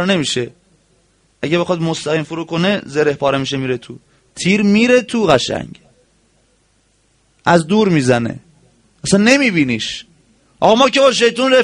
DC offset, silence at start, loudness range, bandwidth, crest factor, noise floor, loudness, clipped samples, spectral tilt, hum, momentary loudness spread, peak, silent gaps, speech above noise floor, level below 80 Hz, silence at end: under 0.1%; 0 s; 4 LU; 10.5 kHz; 16 dB; -58 dBFS; -15 LUFS; under 0.1%; -4.5 dB/octave; none; 13 LU; 0 dBFS; none; 44 dB; -50 dBFS; 0 s